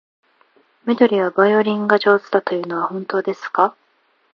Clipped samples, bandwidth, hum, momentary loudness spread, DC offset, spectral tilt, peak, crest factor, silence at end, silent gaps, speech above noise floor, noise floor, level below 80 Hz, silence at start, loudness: under 0.1%; 6.8 kHz; none; 8 LU; under 0.1%; -7 dB/octave; 0 dBFS; 18 dB; 0.65 s; none; 44 dB; -62 dBFS; -72 dBFS; 0.85 s; -18 LUFS